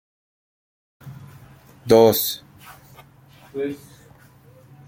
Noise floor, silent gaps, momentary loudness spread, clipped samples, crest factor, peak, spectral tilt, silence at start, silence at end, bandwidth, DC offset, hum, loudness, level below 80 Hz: -50 dBFS; none; 28 LU; under 0.1%; 22 dB; -2 dBFS; -5 dB/octave; 1.05 s; 1.15 s; 17 kHz; under 0.1%; none; -18 LUFS; -60 dBFS